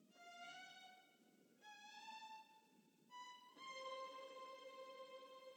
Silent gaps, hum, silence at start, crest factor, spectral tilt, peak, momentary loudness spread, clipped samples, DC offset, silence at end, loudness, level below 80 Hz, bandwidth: none; none; 0 s; 16 dB; -1 dB/octave; -42 dBFS; 11 LU; under 0.1%; under 0.1%; 0 s; -57 LUFS; under -90 dBFS; 19 kHz